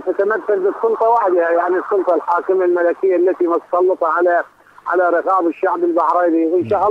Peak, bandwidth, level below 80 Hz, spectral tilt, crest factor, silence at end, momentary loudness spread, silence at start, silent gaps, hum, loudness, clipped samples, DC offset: -4 dBFS; 5 kHz; -64 dBFS; -8 dB/octave; 10 dB; 0 s; 3 LU; 0 s; none; none; -16 LUFS; under 0.1%; under 0.1%